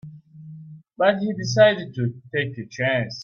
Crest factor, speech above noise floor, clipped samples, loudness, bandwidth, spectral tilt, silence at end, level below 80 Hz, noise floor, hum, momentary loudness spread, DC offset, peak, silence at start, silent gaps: 20 dB; 20 dB; under 0.1%; -22 LUFS; 7.2 kHz; -5.5 dB/octave; 0 s; -62 dBFS; -42 dBFS; none; 24 LU; under 0.1%; -4 dBFS; 0.05 s; none